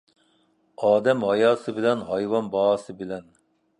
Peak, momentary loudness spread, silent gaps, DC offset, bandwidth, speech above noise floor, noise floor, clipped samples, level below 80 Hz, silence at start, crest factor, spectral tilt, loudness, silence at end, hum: -6 dBFS; 14 LU; none; under 0.1%; 10.5 kHz; 42 dB; -65 dBFS; under 0.1%; -66 dBFS; 0.8 s; 18 dB; -6 dB/octave; -23 LUFS; 0.6 s; none